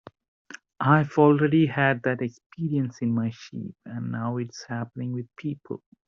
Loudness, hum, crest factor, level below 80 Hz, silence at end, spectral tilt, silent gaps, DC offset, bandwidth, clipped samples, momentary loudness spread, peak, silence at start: -25 LUFS; none; 20 dB; -66 dBFS; 0.3 s; -6.5 dB/octave; 2.46-2.50 s; under 0.1%; 7 kHz; under 0.1%; 18 LU; -6 dBFS; 0.5 s